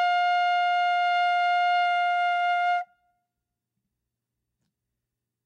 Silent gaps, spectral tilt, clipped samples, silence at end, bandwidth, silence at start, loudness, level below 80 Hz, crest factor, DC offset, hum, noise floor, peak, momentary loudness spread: none; 2.5 dB/octave; under 0.1%; 2.6 s; 8.2 kHz; 0 s; -24 LUFS; under -90 dBFS; 8 dB; under 0.1%; none; -85 dBFS; -18 dBFS; 3 LU